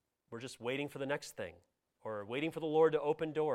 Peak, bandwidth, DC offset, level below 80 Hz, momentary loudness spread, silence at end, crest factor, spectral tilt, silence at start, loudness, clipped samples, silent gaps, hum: -18 dBFS; 15 kHz; under 0.1%; -76 dBFS; 17 LU; 0 s; 20 dB; -5.5 dB/octave; 0.3 s; -36 LUFS; under 0.1%; none; none